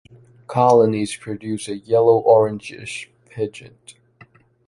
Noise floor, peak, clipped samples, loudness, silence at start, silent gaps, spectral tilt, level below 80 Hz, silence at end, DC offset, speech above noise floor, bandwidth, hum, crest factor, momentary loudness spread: -51 dBFS; -2 dBFS; under 0.1%; -18 LUFS; 0.5 s; none; -6 dB/octave; -60 dBFS; 0.75 s; under 0.1%; 33 dB; 11.5 kHz; none; 18 dB; 17 LU